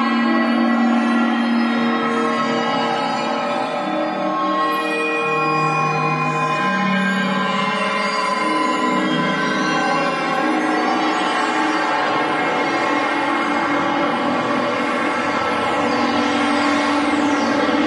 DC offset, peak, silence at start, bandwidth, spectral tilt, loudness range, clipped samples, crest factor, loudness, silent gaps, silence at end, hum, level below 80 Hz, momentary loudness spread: under 0.1%; -6 dBFS; 0 s; 12 kHz; -5 dB/octave; 1 LU; under 0.1%; 14 dB; -18 LUFS; none; 0 s; none; -64 dBFS; 2 LU